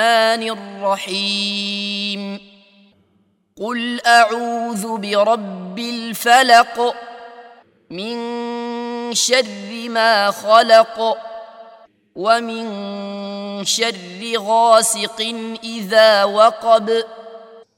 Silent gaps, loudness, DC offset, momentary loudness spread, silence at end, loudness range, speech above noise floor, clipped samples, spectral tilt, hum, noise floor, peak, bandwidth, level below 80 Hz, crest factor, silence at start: none; -16 LUFS; under 0.1%; 15 LU; 0.15 s; 7 LU; 44 dB; under 0.1%; -2 dB/octave; none; -61 dBFS; 0 dBFS; 16.5 kHz; -70 dBFS; 18 dB; 0 s